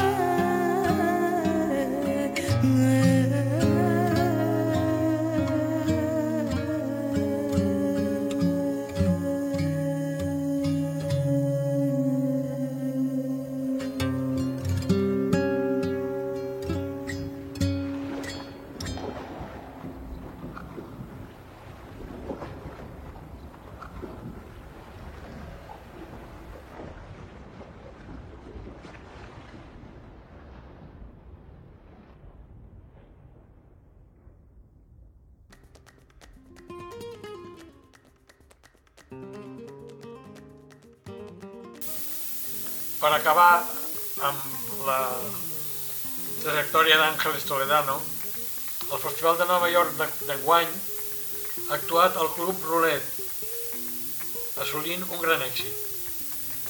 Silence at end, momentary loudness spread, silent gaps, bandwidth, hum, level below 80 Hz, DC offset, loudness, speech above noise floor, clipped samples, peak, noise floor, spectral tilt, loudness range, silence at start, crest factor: 0 s; 22 LU; none; 19.5 kHz; none; -52 dBFS; under 0.1%; -25 LUFS; 34 dB; under 0.1%; -4 dBFS; -58 dBFS; -5 dB/octave; 22 LU; 0 s; 24 dB